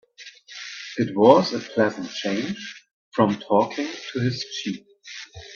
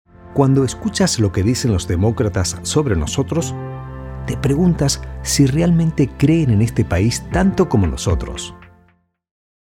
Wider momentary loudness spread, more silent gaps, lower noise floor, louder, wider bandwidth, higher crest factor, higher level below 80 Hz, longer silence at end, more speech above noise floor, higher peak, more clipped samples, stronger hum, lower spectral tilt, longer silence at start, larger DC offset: first, 21 LU vs 11 LU; first, 2.93-3.12 s vs none; second, -46 dBFS vs -57 dBFS; second, -23 LUFS vs -17 LUFS; second, 7.2 kHz vs 17 kHz; first, 24 dB vs 16 dB; second, -64 dBFS vs -32 dBFS; second, 0 s vs 1.05 s; second, 24 dB vs 41 dB; about the same, 0 dBFS vs -2 dBFS; neither; neither; about the same, -5.5 dB/octave vs -5.5 dB/octave; about the same, 0.2 s vs 0.25 s; neither